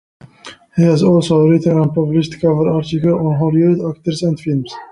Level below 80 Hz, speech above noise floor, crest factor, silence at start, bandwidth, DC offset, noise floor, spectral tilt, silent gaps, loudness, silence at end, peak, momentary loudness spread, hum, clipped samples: -48 dBFS; 25 dB; 12 dB; 0.45 s; 11 kHz; under 0.1%; -39 dBFS; -8 dB/octave; none; -15 LUFS; 0.05 s; -2 dBFS; 8 LU; none; under 0.1%